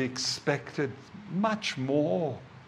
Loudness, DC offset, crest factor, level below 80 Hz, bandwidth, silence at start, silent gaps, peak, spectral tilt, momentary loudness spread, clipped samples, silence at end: -30 LUFS; under 0.1%; 20 dB; -70 dBFS; 13.5 kHz; 0 s; none; -12 dBFS; -4.5 dB/octave; 8 LU; under 0.1%; 0 s